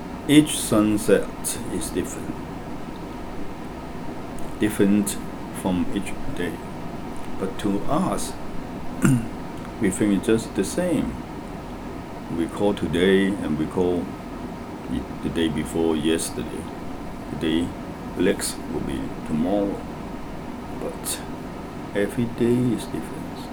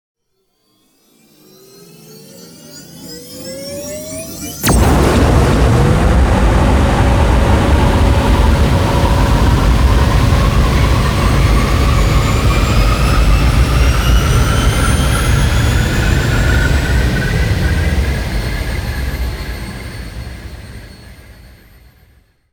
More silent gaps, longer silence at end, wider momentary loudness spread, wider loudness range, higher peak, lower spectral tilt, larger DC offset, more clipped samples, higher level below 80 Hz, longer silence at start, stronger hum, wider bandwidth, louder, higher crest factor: neither; second, 0 s vs 1.2 s; about the same, 14 LU vs 16 LU; second, 4 LU vs 14 LU; second, -4 dBFS vs 0 dBFS; about the same, -5 dB/octave vs -5.5 dB/octave; neither; neither; second, -42 dBFS vs -16 dBFS; second, 0 s vs 2.15 s; neither; about the same, over 20 kHz vs over 20 kHz; second, -25 LUFS vs -13 LUFS; first, 22 dB vs 12 dB